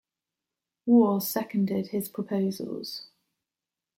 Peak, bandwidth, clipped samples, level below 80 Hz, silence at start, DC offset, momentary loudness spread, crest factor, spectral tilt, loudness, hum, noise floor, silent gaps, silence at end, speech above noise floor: -10 dBFS; 16.5 kHz; under 0.1%; -76 dBFS; 0.85 s; under 0.1%; 15 LU; 18 dB; -6 dB/octave; -27 LUFS; none; -90 dBFS; none; 0.95 s; 64 dB